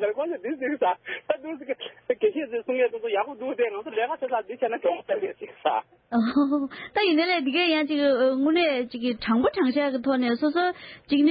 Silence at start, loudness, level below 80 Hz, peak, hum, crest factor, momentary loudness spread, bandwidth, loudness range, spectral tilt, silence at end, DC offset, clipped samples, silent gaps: 0 s; -25 LUFS; -64 dBFS; -10 dBFS; none; 14 dB; 8 LU; 5.2 kHz; 5 LU; -9 dB/octave; 0 s; under 0.1%; under 0.1%; none